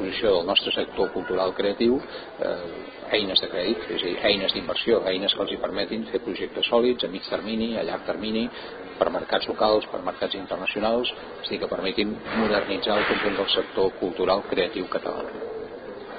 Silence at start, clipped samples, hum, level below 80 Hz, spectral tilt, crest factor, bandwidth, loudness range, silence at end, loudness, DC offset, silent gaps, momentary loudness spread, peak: 0 s; under 0.1%; none; -54 dBFS; -8.5 dB/octave; 20 dB; 5 kHz; 2 LU; 0 s; -25 LUFS; under 0.1%; none; 10 LU; -6 dBFS